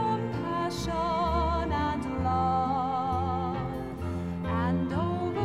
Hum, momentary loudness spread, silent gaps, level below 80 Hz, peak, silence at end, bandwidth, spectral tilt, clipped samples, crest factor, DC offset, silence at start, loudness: none; 6 LU; none; -42 dBFS; -16 dBFS; 0 s; 13 kHz; -7 dB/octave; under 0.1%; 14 dB; 0.2%; 0 s; -29 LUFS